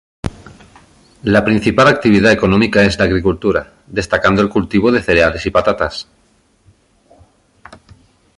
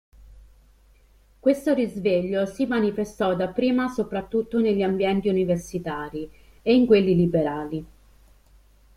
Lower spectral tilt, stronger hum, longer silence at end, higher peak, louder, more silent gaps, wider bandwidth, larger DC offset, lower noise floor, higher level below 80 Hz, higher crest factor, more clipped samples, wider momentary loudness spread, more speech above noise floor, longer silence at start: about the same, -6 dB/octave vs -7 dB/octave; neither; first, 2.35 s vs 1.1 s; first, 0 dBFS vs -6 dBFS; first, -13 LUFS vs -23 LUFS; neither; second, 11 kHz vs 14 kHz; neither; about the same, -55 dBFS vs -56 dBFS; first, -36 dBFS vs -50 dBFS; about the same, 16 dB vs 18 dB; neither; about the same, 13 LU vs 12 LU; first, 42 dB vs 34 dB; about the same, 0.25 s vs 0.2 s